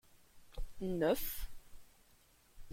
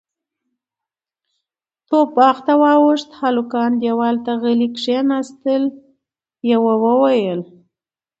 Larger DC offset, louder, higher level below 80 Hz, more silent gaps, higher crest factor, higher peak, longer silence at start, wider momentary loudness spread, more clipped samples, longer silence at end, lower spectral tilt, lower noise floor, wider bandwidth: neither; second, -38 LUFS vs -16 LUFS; first, -50 dBFS vs -68 dBFS; neither; about the same, 20 dB vs 18 dB; second, -22 dBFS vs 0 dBFS; second, 0.15 s vs 1.9 s; first, 19 LU vs 7 LU; neither; second, 0 s vs 0.75 s; about the same, -5 dB/octave vs -6 dB/octave; second, -67 dBFS vs -88 dBFS; first, 16.5 kHz vs 8 kHz